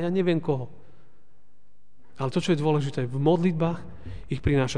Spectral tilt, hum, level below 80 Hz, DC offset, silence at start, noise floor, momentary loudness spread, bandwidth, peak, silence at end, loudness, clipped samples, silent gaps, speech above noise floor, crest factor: -7 dB/octave; none; -46 dBFS; 1%; 0 s; -68 dBFS; 14 LU; 10 kHz; -8 dBFS; 0 s; -26 LUFS; under 0.1%; none; 43 dB; 18 dB